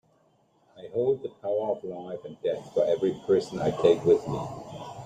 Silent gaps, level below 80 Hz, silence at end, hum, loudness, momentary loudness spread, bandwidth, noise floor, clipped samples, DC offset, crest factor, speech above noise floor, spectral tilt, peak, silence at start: none; -62 dBFS; 0 s; none; -27 LUFS; 15 LU; 9.2 kHz; -65 dBFS; under 0.1%; under 0.1%; 20 dB; 39 dB; -7 dB/octave; -8 dBFS; 0.75 s